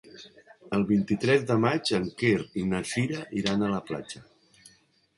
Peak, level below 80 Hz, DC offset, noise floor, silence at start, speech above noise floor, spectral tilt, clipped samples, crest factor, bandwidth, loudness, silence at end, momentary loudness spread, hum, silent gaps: -10 dBFS; -58 dBFS; under 0.1%; -62 dBFS; 0.05 s; 36 dB; -5.5 dB/octave; under 0.1%; 18 dB; 11.5 kHz; -27 LUFS; 0.95 s; 13 LU; none; none